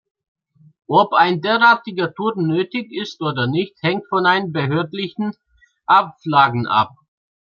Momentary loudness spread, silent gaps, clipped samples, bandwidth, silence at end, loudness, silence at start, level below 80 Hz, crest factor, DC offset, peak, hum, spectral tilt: 11 LU; none; under 0.1%; 7.2 kHz; 0.65 s; -18 LUFS; 0.9 s; -64 dBFS; 18 dB; under 0.1%; -2 dBFS; none; -7 dB/octave